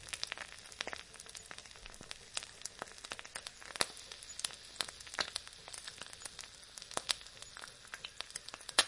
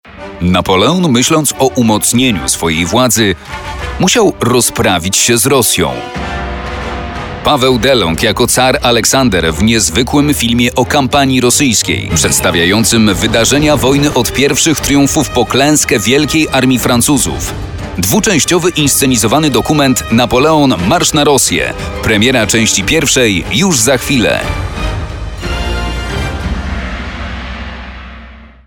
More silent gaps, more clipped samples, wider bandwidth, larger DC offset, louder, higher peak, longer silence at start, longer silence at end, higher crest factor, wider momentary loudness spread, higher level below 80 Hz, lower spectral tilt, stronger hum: neither; neither; second, 11.5 kHz vs 19.5 kHz; neither; second, -43 LUFS vs -10 LUFS; second, -8 dBFS vs 0 dBFS; about the same, 0 s vs 0.05 s; second, 0 s vs 0.2 s; first, 36 dB vs 10 dB; about the same, 12 LU vs 12 LU; second, -68 dBFS vs -26 dBFS; second, 0.5 dB/octave vs -3.5 dB/octave; neither